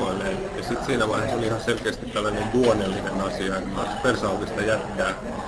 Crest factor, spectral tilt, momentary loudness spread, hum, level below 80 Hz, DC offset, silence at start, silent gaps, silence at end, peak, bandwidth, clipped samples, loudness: 16 dB; -5 dB/octave; 6 LU; none; -42 dBFS; under 0.1%; 0 s; none; 0 s; -8 dBFS; 11 kHz; under 0.1%; -25 LUFS